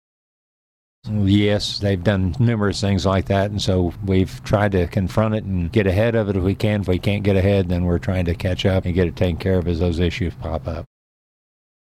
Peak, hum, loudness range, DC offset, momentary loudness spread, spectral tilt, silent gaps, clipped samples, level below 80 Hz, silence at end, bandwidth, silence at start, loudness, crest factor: -6 dBFS; none; 2 LU; under 0.1%; 5 LU; -7 dB/octave; none; under 0.1%; -36 dBFS; 1 s; 13 kHz; 1.05 s; -20 LUFS; 14 dB